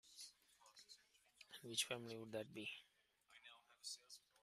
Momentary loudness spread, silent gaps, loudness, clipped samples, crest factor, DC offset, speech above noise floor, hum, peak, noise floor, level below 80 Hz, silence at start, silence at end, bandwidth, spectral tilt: 21 LU; none; -50 LUFS; under 0.1%; 28 dB; under 0.1%; 27 dB; none; -28 dBFS; -77 dBFS; under -90 dBFS; 0.05 s; 0.25 s; 15.5 kHz; -2 dB/octave